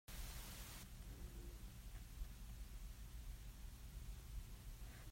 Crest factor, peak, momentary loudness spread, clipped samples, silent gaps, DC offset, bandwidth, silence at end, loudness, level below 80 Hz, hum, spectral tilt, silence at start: 16 dB; -38 dBFS; 4 LU; under 0.1%; none; under 0.1%; 16 kHz; 0 s; -56 LUFS; -54 dBFS; none; -4 dB/octave; 0.1 s